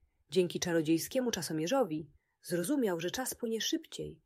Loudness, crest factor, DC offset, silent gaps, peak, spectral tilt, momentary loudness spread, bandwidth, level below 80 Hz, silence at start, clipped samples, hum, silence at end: -33 LUFS; 18 dB; under 0.1%; none; -16 dBFS; -4 dB/octave; 8 LU; 16 kHz; -68 dBFS; 0.3 s; under 0.1%; none; 0.1 s